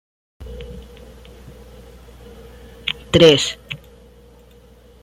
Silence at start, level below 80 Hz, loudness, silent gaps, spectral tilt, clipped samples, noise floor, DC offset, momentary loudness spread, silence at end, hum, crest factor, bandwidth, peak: 0.4 s; -42 dBFS; -15 LUFS; none; -4.5 dB/octave; under 0.1%; -47 dBFS; under 0.1%; 27 LU; 1.25 s; 60 Hz at -45 dBFS; 22 dB; 15 kHz; -2 dBFS